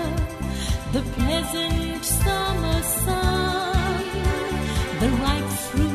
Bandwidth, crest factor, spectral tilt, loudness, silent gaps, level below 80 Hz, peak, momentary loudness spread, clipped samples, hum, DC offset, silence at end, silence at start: 14 kHz; 14 dB; -4.5 dB/octave; -24 LUFS; none; -30 dBFS; -8 dBFS; 5 LU; under 0.1%; none; under 0.1%; 0 s; 0 s